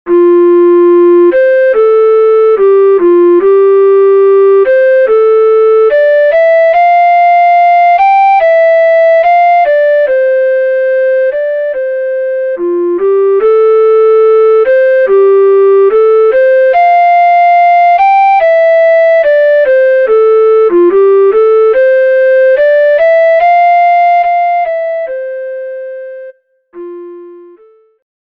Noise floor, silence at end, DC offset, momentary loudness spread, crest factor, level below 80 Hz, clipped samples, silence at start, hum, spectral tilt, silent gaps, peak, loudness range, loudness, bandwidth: -42 dBFS; 0.9 s; 0.3%; 8 LU; 6 dB; -54 dBFS; under 0.1%; 0.05 s; none; -5.5 dB/octave; none; 0 dBFS; 5 LU; -7 LUFS; 5.2 kHz